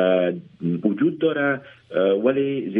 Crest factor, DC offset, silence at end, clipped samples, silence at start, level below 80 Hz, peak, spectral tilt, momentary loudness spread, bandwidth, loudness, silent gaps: 16 dB; under 0.1%; 0 s; under 0.1%; 0 s; -70 dBFS; -6 dBFS; -10 dB/octave; 9 LU; 3.9 kHz; -22 LUFS; none